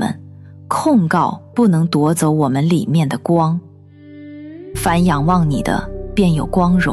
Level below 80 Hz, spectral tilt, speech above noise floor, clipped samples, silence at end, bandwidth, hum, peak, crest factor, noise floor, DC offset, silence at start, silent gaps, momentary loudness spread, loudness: -34 dBFS; -6.5 dB/octave; 25 dB; under 0.1%; 0 s; 14 kHz; 50 Hz at -45 dBFS; -2 dBFS; 14 dB; -40 dBFS; under 0.1%; 0 s; none; 11 LU; -16 LUFS